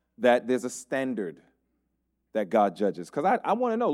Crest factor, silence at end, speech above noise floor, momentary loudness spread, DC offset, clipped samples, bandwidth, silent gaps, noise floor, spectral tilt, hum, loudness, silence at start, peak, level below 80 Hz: 20 dB; 0 s; 51 dB; 9 LU; under 0.1%; under 0.1%; 14 kHz; none; -77 dBFS; -5 dB/octave; none; -27 LUFS; 0.2 s; -8 dBFS; -78 dBFS